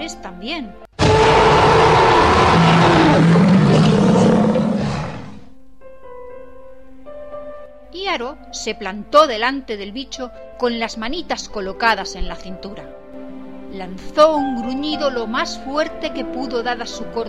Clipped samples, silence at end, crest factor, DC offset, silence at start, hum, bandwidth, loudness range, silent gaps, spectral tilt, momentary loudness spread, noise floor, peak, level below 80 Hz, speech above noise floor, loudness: under 0.1%; 0 s; 18 dB; 0.8%; 0 s; none; 11 kHz; 16 LU; none; -6 dB/octave; 22 LU; -44 dBFS; 0 dBFS; -36 dBFS; 26 dB; -16 LUFS